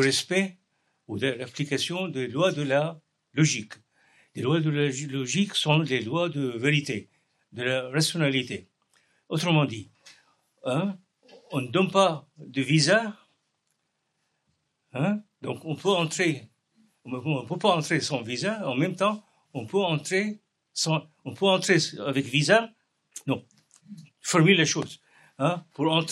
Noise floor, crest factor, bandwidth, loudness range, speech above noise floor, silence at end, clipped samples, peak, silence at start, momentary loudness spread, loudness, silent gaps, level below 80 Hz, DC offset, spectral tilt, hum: -77 dBFS; 24 dB; 12.5 kHz; 4 LU; 51 dB; 0 s; under 0.1%; -4 dBFS; 0 s; 15 LU; -26 LUFS; none; -78 dBFS; under 0.1%; -4.5 dB/octave; none